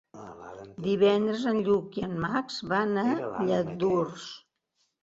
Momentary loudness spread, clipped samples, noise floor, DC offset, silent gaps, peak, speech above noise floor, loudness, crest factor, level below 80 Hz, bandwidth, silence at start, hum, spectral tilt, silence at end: 20 LU; under 0.1%; -76 dBFS; under 0.1%; none; -12 dBFS; 49 dB; -28 LUFS; 18 dB; -64 dBFS; 7.8 kHz; 0.15 s; none; -6.5 dB/octave; 0.65 s